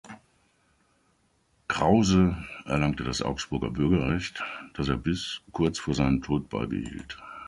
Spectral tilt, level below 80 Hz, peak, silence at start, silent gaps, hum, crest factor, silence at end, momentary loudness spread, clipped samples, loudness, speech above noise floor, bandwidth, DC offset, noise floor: -6 dB/octave; -44 dBFS; -8 dBFS; 0.05 s; none; none; 20 dB; 0 s; 13 LU; under 0.1%; -27 LUFS; 41 dB; 11.5 kHz; under 0.1%; -68 dBFS